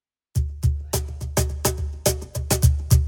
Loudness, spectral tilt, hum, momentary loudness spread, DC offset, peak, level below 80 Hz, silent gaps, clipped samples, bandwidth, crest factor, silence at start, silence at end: -24 LUFS; -4.5 dB/octave; none; 8 LU; under 0.1%; -4 dBFS; -26 dBFS; none; under 0.1%; 19 kHz; 18 dB; 0.35 s; 0 s